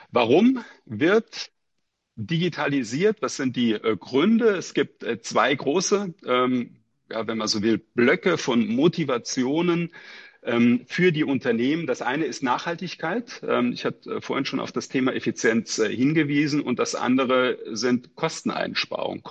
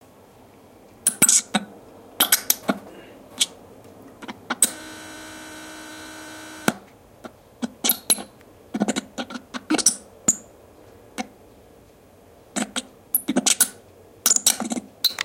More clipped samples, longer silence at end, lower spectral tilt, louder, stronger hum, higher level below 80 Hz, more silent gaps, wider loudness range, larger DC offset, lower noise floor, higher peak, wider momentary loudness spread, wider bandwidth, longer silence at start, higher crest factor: neither; about the same, 0 s vs 0 s; first, -5 dB/octave vs -1 dB/octave; about the same, -23 LUFS vs -21 LUFS; neither; second, -68 dBFS vs -62 dBFS; neither; second, 3 LU vs 7 LU; neither; first, -78 dBFS vs -51 dBFS; second, -6 dBFS vs 0 dBFS; second, 9 LU vs 20 LU; second, 8.6 kHz vs 17 kHz; second, 0 s vs 1.05 s; second, 18 dB vs 26 dB